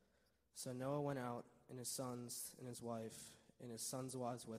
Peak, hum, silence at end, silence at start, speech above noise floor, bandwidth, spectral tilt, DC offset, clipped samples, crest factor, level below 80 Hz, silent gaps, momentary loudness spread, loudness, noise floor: -30 dBFS; none; 0 s; 0.55 s; 32 dB; 15.5 kHz; -4.5 dB/octave; under 0.1%; under 0.1%; 18 dB; -84 dBFS; none; 13 LU; -48 LUFS; -80 dBFS